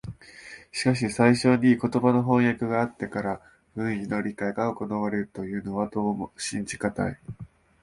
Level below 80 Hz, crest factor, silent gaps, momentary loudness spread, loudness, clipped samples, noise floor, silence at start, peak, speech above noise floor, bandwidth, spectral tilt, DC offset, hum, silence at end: -56 dBFS; 20 dB; none; 19 LU; -26 LUFS; under 0.1%; -47 dBFS; 0.05 s; -6 dBFS; 21 dB; 11.5 kHz; -6 dB/octave; under 0.1%; none; 0.35 s